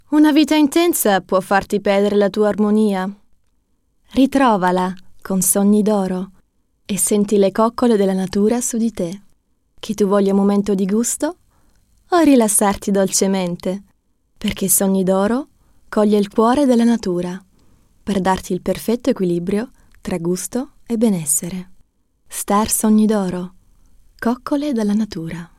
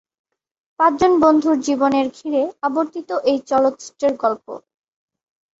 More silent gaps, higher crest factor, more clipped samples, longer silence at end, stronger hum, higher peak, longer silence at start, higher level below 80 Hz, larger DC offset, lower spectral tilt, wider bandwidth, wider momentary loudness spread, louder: neither; about the same, 16 dB vs 18 dB; neither; second, 0.1 s vs 1 s; neither; about the same, -2 dBFS vs -2 dBFS; second, 0.1 s vs 0.8 s; first, -48 dBFS vs -56 dBFS; neither; about the same, -5 dB/octave vs -4.5 dB/octave; first, 16.5 kHz vs 8 kHz; first, 13 LU vs 9 LU; about the same, -17 LUFS vs -18 LUFS